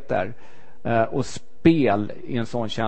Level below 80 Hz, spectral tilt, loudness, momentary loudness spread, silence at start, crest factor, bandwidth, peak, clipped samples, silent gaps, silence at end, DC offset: -50 dBFS; -6.5 dB/octave; -23 LUFS; 13 LU; 0.1 s; 20 dB; 8.6 kHz; -2 dBFS; under 0.1%; none; 0 s; 3%